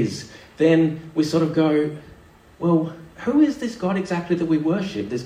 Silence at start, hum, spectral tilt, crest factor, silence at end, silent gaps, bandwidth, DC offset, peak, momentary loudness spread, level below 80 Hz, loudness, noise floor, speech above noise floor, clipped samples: 0 s; none; -7 dB/octave; 16 dB; 0 s; none; 10 kHz; under 0.1%; -6 dBFS; 10 LU; -56 dBFS; -21 LUFS; -48 dBFS; 27 dB; under 0.1%